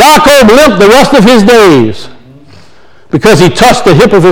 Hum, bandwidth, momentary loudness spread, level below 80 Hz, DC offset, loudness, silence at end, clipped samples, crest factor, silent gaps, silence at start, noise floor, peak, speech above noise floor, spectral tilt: none; over 20 kHz; 7 LU; -28 dBFS; under 0.1%; -3 LUFS; 0 s; 20%; 4 dB; none; 0 s; -40 dBFS; 0 dBFS; 37 dB; -5 dB/octave